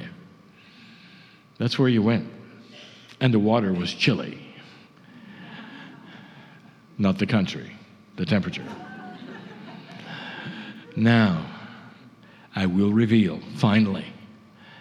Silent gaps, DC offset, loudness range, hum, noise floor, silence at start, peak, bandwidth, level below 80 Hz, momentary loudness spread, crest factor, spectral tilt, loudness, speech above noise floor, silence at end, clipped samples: none; under 0.1%; 7 LU; none; -51 dBFS; 0 s; -6 dBFS; 10 kHz; -64 dBFS; 24 LU; 20 dB; -7 dB/octave; -23 LUFS; 30 dB; 0 s; under 0.1%